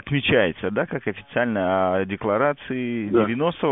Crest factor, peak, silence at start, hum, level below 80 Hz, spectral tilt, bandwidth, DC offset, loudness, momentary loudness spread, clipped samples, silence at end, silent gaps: 18 dB; -6 dBFS; 0.05 s; none; -52 dBFS; -4.5 dB/octave; 4 kHz; under 0.1%; -23 LUFS; 7 LU; under 0.1%; 0 s; none